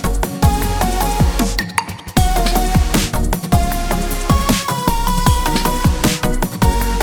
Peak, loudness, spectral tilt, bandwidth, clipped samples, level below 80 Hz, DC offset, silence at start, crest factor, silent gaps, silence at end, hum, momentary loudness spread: 0 dBFS; -17 LUFS; -4.5 dB/octave; over 20 kHz; under 0.1%; -20 dBFS; under 0.1%; 0 s; 14 dB; none; 0 s; none; 4 LU